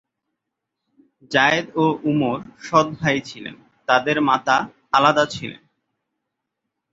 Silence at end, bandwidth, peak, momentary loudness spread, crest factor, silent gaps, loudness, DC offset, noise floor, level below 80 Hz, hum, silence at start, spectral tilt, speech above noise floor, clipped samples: 1.35 s; 7.8 kHz; -2 dBFS; 15 LU; 20 dB; none; -19 LUFS; under 0.1%; -81 dBFS; -60 dBFS; none; 1.3 s; -5 dB/octave; 62 dB; under 0.1%